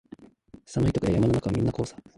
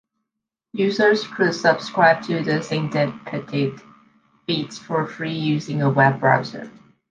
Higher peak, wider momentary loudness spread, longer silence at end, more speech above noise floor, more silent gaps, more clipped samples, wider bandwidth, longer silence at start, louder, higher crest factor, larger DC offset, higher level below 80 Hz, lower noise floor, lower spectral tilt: second, -10 dBFS vs -2 dBFS; about the same, 9 LU vs 11 LU; second, 0.25 s vs 0.4 s; second, 27 dB vs 63 dB; neither; neither; first, 11.5 kHz vs 9.2 kHz; second, 0.2 s vs 0.75 s; second, -26 LUFS vs -20 LUFS; about the same, 16 dB vs 20 dB; neither; first, -44 dBFS vs -64 dBFS; second, -52 dBFS vs -83 dBFS; first, -7.5 dB/octave vs -6 dB/octave